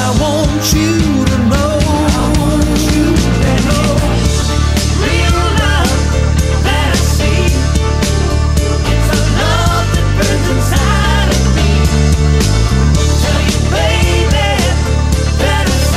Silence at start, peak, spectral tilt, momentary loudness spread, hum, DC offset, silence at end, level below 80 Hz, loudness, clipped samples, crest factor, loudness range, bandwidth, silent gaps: 0 s; 0 dBFS; -5 dB/octave; 2 LU; none; under 0.1%; 0 s; -14 dBFS; -12 LUFS; under 0.1%; 10 dB; 1 LU; 15.5 kHz; none